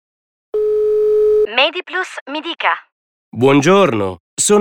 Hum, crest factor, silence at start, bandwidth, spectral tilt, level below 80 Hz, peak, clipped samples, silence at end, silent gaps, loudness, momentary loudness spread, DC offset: none; 16 dB; 0.55 s; 16.5 kHz; -4 dB/octave; -52 dBFS; 0 dBFS; under 0.1%; 0 s; 2.21-2.26 s, 2.92-3.32 s, 4.20-4.37 s; -15 LUFS; 12 LU; under 0.1%